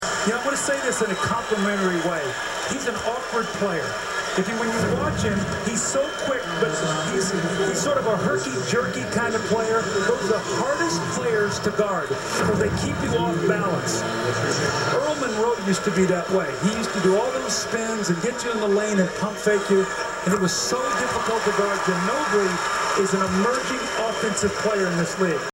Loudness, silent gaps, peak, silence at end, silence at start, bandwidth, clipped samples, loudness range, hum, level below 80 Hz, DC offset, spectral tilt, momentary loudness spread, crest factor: -23 LUFS; none; -6 dBFS; 0.05 s; 0 s; 16.5 kHz; under 0.1%; 2 LU; none; -50 dBFS; under 0.1%; -4 dB/octave; 4 LU; 16 dB